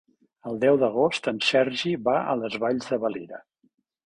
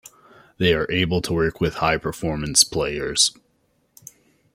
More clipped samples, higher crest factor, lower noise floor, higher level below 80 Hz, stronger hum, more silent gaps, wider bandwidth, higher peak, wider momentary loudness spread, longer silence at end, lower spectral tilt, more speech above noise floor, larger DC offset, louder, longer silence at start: neither; second, 18 dB vs 24 dB; about the same, -69 dBFS vs -66 dBFS; second, -66 dBFS vs -44 dBFS; neither; neither; second, 10.5 kHz vs 16 kHz; second, -8 dBFS vs 0 dBFS; first, 16 LU vs 8 LU; second, 0.65 s vs 1.25 s; first, -5 dB/octave vs -3 dB/octave; about the same, 45 dB vs 45 dB; neither; second, -24 LUFS vs -20 LUFS; second, 0.45 s vs 0.6 s